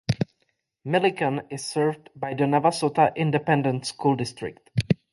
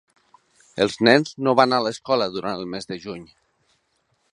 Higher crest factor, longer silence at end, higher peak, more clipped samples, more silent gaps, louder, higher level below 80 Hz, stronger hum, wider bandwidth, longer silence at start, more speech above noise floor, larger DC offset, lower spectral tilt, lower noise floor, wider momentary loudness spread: about the same, 18 dB vs 22 dB; second, 0.15 s vs 1.1 s; second, -6 dBFS vs 0 dBFS; neither; neither; second, -25 LUFS vs -21 LUFS; first, -54 dBFS vs -62 dBFS; neither; about the same, 11.5 kHz vs 11.5 kHz; second, 0.1 s vs 0.75 s; about the same, 49 dB vs 48 dB; neither; about the same, -6 dB/octave vs -5 dB/octave; first, -73 dBFS vs -69 dBFS; second, 11 LU vs 17 LU